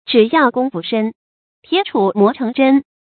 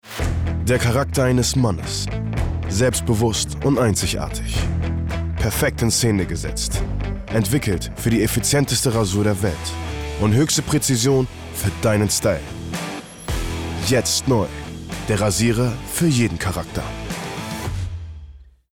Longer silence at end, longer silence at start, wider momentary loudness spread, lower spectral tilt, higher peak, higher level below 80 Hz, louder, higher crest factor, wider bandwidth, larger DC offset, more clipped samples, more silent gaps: about the same, 0.3 s vs 0.3 s; about the same, 0.05 s vs 0.05 s; second, 7 LU vs 10 LU; first, -10.5 dB/octave vs -4.5 dB/octave; first, 0 dBFS vs -8 dBFS; second, -64 dBFS vs -32 dBFS; first, -15 LUFS vs -21 LUFS; about the same, 16 dB vs 12 dB; second, 4.6 kHz vs 19 kHz; neither; neither; first, 1.15-1.63 s vs none